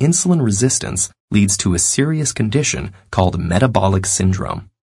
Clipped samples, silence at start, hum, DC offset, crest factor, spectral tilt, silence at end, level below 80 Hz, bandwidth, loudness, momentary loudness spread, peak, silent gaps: under 0.1%; 0 s; none; under 0.1%; 16 dB; -4.5 dB/octave; 0.35 s; -42 dBFS; 11.5 kHz; -16 LUFS; 7 LU; 0 dBFS; 1.20-1.28 s